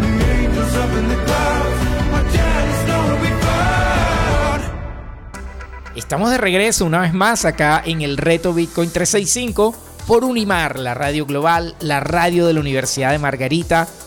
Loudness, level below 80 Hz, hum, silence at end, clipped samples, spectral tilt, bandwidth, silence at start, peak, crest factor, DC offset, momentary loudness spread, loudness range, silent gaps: -17 LUFS; -26 dBFS; none; 0 s; under 0.1%; -4.5 dB/octave; 19 kHz; 0 s; -4 dBFS; 14 dB; under 0.1%; 9 LU; 3 LU; none